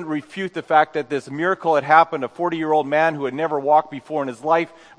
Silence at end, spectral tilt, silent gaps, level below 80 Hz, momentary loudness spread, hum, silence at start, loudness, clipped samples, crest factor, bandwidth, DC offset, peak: 0.3 s; -6 dB/octave; none; -72 dBFS; 11 LU; none; 0 s; -20 LUFS; under 0.1%; 20 dB; 10 kHz; under 0.1%; 0 dBFS